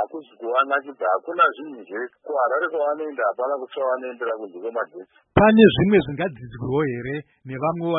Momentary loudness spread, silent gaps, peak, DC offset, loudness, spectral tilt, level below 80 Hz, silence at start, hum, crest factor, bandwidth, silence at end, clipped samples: 16 LU; none; 0 dBFS; under 0.1%; -22 LUFS; -11 dB/octave; -50 dBFS; 0 s; none; 22 dB; 4 kHz; 0 s; under 0.1%